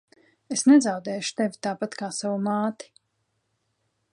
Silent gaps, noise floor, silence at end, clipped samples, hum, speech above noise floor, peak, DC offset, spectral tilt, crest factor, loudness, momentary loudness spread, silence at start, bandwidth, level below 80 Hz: none; -75 dBFS; 1.4 s; under 0.1%; none; 51 dB; -8 dBFS; under 0.1%; -4.5 dB/octave; 18 dB; -24 LUFS; 12 LU; 0.5 s; 11.5 kHz; -78 dBFS